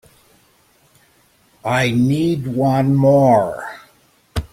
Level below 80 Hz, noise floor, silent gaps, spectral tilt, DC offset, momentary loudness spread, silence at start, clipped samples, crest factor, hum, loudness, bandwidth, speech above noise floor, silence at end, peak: -42 dBFS; -56 dBFS; none; -7.5 dB/octave; under 0.1%; 16 LU; 1.65 s; under 0.1%; 16 dB; none; -16 LUFS; 16 kHz; 41 dB; 0.05 s; -2 dBFS